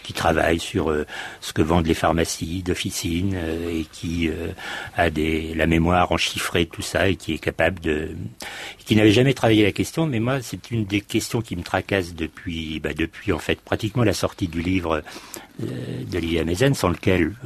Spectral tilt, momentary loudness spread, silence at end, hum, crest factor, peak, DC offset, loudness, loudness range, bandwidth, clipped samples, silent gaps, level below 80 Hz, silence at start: -5 dB/octave; 12 LU; 0 s; none; 20 dB; -4 dBFS; under 0.1%; -23 LUFS; 4 LU; 13.5 kHz; under 0.1%; none; -40 dBFS; 0 s